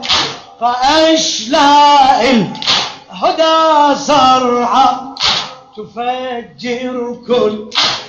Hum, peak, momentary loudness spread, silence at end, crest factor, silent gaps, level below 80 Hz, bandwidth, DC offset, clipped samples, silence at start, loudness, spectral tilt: none; 0 dBFS; 13 LU; 0 s; 12 dB; none; -46 dBFS; 8.4 kHz; under 0.1%; under 0.1%; 0 s; -12 LUFS; -2.5 dB/octave